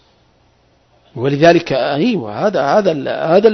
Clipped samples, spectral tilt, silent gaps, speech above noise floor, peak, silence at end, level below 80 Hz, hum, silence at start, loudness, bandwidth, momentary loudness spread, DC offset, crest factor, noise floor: under 0.1%; -6.5 dB/octave; none; 41 dB; 0 dBFS; 0 s; -52 dBFS; none; 1.15 s; -14 LUFS; 6.4 kHz; 8 LU; under 0.1%; 14 dB; -54 dBFS